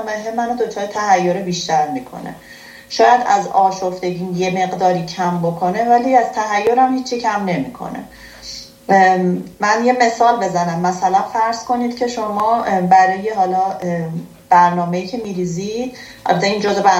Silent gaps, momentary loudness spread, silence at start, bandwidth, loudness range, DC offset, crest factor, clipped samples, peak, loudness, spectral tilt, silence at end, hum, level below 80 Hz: none; 15 LU; 0 s; 16 kHz; 2 LU; under 0.1%; 16 dB; under 0.1%; 0 dBFS; -16 LUFS; -5 dB/octave; 0 s; none; -54 dBFS